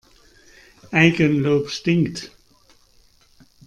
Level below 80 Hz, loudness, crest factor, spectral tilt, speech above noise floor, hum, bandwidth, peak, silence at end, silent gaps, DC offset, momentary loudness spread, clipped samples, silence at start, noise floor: -56 dBFS; -19 LUFS; 22 dB; -6 dB/octave; 37 dB; none; 10 kHz; 0 dBFS; 1.4 s; none; under 0.1%; 13 LU; under 0.1%; 0.9 s; -55 dBFS